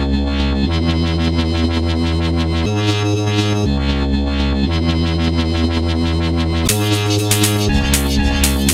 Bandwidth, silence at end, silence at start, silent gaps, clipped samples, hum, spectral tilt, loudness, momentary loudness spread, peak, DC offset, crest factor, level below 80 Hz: 16 kHz; 0 s; 0 s; none; under 0.1%; none; -5 dB/octave; -16 LUFS; 3 LU; 0 dBFS; under 0.1%; 16 dB; -22 dBFS